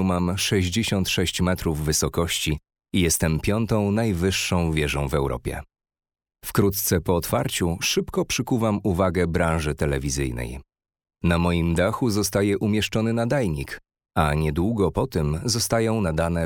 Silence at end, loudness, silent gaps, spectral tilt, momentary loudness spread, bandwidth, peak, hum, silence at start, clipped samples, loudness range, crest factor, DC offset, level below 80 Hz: 0 s; -23 LUFS; none; -5 dB/octave; 6 LU; over 20 kHz; -4 dBFS; none; 0 s; under 0.1%; 2 LU; 20 dB; under 0.1%; -40 dBFS